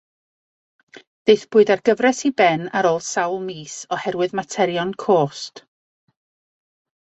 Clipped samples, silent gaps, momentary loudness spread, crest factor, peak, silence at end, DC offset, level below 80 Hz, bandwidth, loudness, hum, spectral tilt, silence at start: under 0.1%; none; 12 LU; 20 dB; -2 dBFS; 1.45 s; under 0.1%; -66 dBFS; 8.2 kHz; -19 LUFS; none; -4.5 dB/octave; 1.25 s